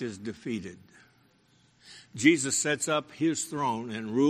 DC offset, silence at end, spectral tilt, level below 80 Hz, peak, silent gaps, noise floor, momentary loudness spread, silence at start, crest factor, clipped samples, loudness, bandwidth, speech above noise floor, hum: under 0.1%; 0 s; -3.5 dB/octave; -70 dBFS; -6 dBFS; none; -64 dBFS; 14 LU; 0 s; 24 dB; under 0.1%; -28 LUFS; 13.5 kHz; 35 dB; none